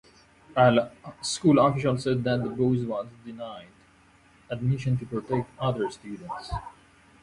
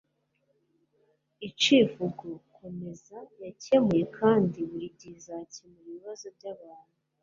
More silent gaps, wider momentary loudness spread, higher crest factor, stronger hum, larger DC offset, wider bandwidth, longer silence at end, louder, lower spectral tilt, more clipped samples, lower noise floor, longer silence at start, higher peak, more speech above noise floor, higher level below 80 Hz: neither; second, 18 LU vs 23 LU; about the same, 18 dB vs 20 dB; neither; neither; first, 11.5 kHz vs 7.6 kHz; about the same, 0.5 s vs 0.5 s; about the same, -26 LUFS vs -25 LUFS; first, -6.5 dB/octave vs -5 dB/octave; neither; second, -58 dBFS vs -74 dBFS; second, 0.5 s vs 1.4 s; about the same, -8 dBFS vs -10 dBFS; second, 32 dB vs 46 dB; first, -52 dBFS vs -70 dBFS